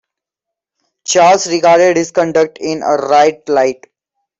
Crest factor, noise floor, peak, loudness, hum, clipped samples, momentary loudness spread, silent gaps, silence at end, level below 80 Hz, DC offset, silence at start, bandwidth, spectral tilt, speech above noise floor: 12 dB; -82 dBFS; 0 dBFS; -12 LUFS; none; under 0.1%; 8 LU; none; 0.65 s; -60 dBFS; under 0.1%; 1.05 s; 8.2 kHz; -3.5 dB/octave; 71 dB